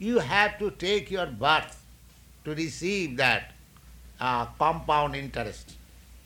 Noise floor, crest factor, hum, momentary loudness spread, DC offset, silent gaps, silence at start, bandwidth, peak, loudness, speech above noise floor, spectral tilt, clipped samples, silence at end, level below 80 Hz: -53 dBFS; 22 dB; none; 13 LU; under 0.1%; none; 0 s; 19.5 kHz; -8 dBFS; -27 LUFS; 26 dB; -4.5 dB/octave; under 0.1%; 0.05 s; -50 dBFS